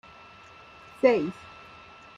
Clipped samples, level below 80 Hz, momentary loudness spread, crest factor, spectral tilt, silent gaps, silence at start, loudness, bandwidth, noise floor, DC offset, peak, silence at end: under 0.1%; -66 dBFS; 25 LU; 24 dB; -6.5 dB/octave; none; 1.05 s; -25 LUFS; 9.6 kHz; -50 dBFS; under 0.1%; -6 dBFS; 0.85 s